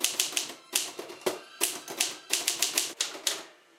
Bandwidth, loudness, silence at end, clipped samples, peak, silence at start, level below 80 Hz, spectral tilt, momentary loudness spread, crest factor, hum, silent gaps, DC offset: 16.5 kHz; -30 LUFS; 0.25 s; under 0.1%; -6 dBFS; 0 s; -82 dBFS; 1 dB/octave; 8 LU; 26 dB; none; none; under 0.1%